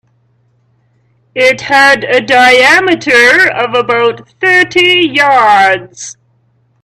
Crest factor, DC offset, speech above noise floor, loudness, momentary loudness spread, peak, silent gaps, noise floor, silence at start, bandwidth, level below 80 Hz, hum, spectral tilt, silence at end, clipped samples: 10 dB; under 0.1%; 46 dB; -7 LUFS; 9 LU; 0 dBFS; none; -54 dBFS; 1.35 s; 14.5 kHz; -52 dBFS; none; -2.5 dB/octave; 0.7 s; 0.2%